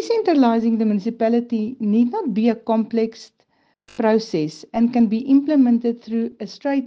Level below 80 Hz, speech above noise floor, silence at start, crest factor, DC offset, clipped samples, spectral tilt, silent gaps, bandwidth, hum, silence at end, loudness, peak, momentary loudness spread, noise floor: -64 dBFS; 45 dB; 0 s; 14 dB; under 0.1%; under 0.1%; -7 dB/octave; none; 7.4 kHz; none; 0 s; -19 LUFS; -4 dBFS; 9 LU; -63 dBFS